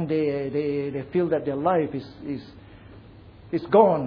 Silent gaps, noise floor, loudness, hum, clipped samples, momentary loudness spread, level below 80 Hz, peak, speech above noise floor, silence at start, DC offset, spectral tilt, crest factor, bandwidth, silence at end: none; -47 dBFS; -25 LUFS; none; under 0.1%; 15 LU; -56 dBFS; -4 dBFS; 23 dB; 0 s; under 0.1%; -10 dB/octave; 22 dB; 5.2 kHz; 0 s